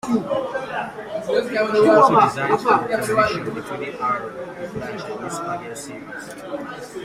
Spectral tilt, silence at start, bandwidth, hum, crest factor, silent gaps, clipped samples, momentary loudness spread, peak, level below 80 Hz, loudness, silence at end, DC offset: -5 dB/octave; 0.05 s; 15 kHz; none; 20 dB; none; under 0.1%; 18 LU; -2 dBFS; -58 dBFS; -20 LUFS; 0 s; under 0.1%